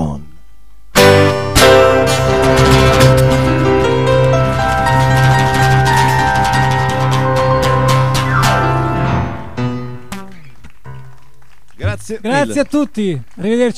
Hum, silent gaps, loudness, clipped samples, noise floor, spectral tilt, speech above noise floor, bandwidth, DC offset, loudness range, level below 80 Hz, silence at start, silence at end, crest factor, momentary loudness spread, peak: none; none; -12 LUFS; 0.1%; -47 dBFS; -5.5 dB/octave; 31 dB; 16 kHz; 4%; 11 LU; -28 dBFS; 0 s; 0.05 s; 12 dB; 13 LU; 0 dBFS